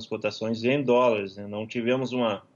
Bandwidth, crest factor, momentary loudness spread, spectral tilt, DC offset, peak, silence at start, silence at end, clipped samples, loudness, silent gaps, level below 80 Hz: 7.2 kHz; 14 dB; 11 LU; -6 dB/octave; under 0.1%; -12 dBFS; 0 s; 0.15 s; under 0.1%; -26 LUFS; none; -72 dBFS